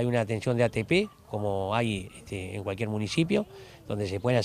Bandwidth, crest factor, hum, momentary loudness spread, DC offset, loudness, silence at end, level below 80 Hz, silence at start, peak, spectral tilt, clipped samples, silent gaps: 15 kHz; 18 dB; none; 11 LU; under 0.1%; -29 LUFS; 0 s; -56 dBFS; 0 s; -10 dBFS; -6 dB/octave; under 0.1%; none